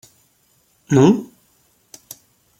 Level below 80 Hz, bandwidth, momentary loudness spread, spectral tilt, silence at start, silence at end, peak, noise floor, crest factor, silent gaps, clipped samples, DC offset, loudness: -60 dBFS; 16.5 kHz; 26 LU; -7 dB/octave; 0.9 s; 1.35 s; -2 dBFS; -60 dBFS; 20 dB; none; under 0.1%; under 0.1%; -16 LUFS